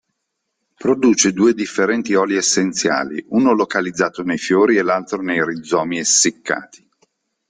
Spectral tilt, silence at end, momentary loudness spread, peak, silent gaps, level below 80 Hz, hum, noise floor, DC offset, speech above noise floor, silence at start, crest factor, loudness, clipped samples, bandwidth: -3 dB/octave; 0.85 s; 7 LU; -2 dBFS; none; -60 dBFS; none; -75 dBFS; under 0.1%; 58 dB; 0.8 s; 16 dB; -17 LUFS; under 0.1%; 10 kHz